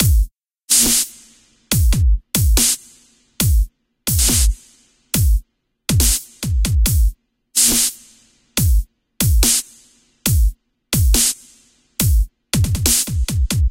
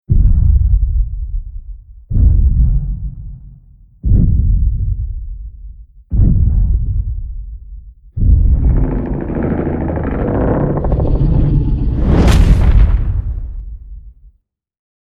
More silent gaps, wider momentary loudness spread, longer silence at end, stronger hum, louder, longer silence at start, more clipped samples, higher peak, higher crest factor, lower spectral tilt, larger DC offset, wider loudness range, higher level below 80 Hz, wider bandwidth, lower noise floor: neither; second, 10 LU vs 19 LU; second, 0 s vs 0.9 s; neither; about the same, -17 LUFS vs -15 LUFS; about the same, 0 s vs 0.1 s; neither; about the same, 0 dBFS vs 0 dBFS; about the same, 16 dB vs 14 dB; second, -3 dB/octave vs -8.5 dB/octave; neither; second, 2 LU vs 5 LU; second, -20 dBFS vs -14 dBFS; first, 17 kHz vs 7.4 kHz; about the same, -53 dBFS vs -54 dBFS